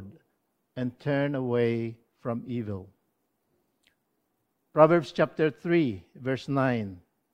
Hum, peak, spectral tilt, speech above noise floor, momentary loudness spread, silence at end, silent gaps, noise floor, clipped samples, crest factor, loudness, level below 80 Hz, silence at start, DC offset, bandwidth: none; -4 dBFS; -8 dB/octave; 50 dB; 16 LU; 0.35 s; none; -76 dBFS; under 0.1%; 26 dB; -27 LUFS; -70 dBFS; 0 s; under 0.1%; 9.2 kHz